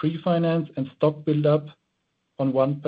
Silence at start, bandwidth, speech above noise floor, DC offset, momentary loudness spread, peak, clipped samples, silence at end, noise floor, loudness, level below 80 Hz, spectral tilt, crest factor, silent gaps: 0 s; 5 kHz; 52 dB; under 0.1%; 5 LU; -8 dBFS; under 0.1%; 0 s; -75 dBFS; -24 LUFS; -66 dBFS; -10.5 dB/octave; 16 dB; none